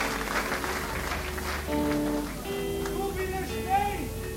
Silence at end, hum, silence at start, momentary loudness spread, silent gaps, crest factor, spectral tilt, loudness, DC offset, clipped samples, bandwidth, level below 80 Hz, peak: 0 s; none; 0 s; 5 LU; none; 16 dB; -4.5 dB/octave; -30 LUFS; under 0.1%; under 0.1%; 16 kHz; -40 dBFS; -14 dBFS